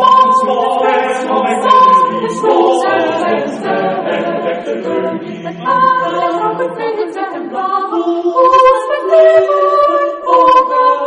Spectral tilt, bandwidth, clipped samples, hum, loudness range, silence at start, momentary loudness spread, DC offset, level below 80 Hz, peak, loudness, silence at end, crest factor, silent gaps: -5 dB/octave; 10 kHz; under 0.1%; none; 6 LU; 0 s; 11 LU; under 0.1%; -54 dBFS; 0 dBFS; -12 LUFS; 0 s; 12 dB; none